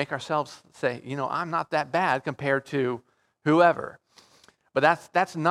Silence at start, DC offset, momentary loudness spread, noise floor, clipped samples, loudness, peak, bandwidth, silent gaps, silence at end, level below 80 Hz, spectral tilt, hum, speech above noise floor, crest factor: 0 s; under 0.1%; 11 LU; -59 dBFS; under 0.1%; -26 LUFS; -4 dBFS; 13.5 kHz; none; 0 s; -72 dBFS; -6 dB/octave; none; 34 dB; 22 dB